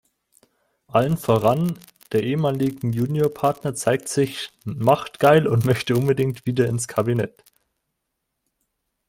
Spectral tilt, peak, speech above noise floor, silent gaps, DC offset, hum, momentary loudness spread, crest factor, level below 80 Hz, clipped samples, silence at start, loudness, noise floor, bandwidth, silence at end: -6 dB/octave; -2 dBFS; 58 dB; none; under 0.1%; none; 8 LU; 20 dB; -56 dBFS; under 0.1%; 0.95 s; -21 LUFS; -78 dBFS; 17 kHz; 1.8 s